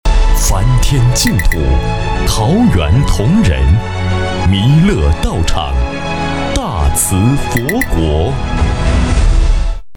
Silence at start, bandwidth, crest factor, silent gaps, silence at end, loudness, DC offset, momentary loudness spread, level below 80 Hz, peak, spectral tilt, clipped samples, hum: 0.05 s; 19.5 kHz; 10 dB; none; 0 s; -13 LUFS; 2%; 6 LU; -14 dBFS; 0 dBFS; -5 dB/octave; under 0.1%; none